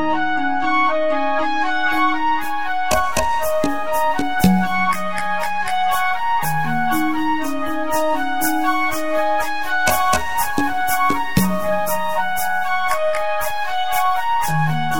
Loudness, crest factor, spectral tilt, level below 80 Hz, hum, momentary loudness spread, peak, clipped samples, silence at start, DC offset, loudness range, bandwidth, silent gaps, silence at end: -19 LUFS; 18 dB; -4 dB/octave; -44 dBFS; none; 4 LU; -2 dBFS; under 0.1%; 0 s; 7%; 1 LU; 17.5 kHz; none; 0 s